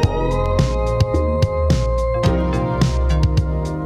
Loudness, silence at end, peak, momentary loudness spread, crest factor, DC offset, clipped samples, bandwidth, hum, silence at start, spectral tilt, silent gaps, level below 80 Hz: -19 LUFS; 0 s; -2 dBFS; 2 LU; 14 dB; under 0.1%; under 0.1%; 11.5 kHz; none; 0 s; -7 dB/octave; none; -22 dBFS